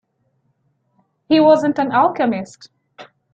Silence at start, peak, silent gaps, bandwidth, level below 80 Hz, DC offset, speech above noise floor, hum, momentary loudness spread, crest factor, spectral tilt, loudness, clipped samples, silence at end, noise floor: 1.3 s; -2 dBFS; none; 7.8 kHz; -64 dBFS; under 0.1%; 50 dB; none; 12 LU; 16 dB; -6 dB/octave; -16 LUFS; under 0.1%; 0.3 s; -66 dBFS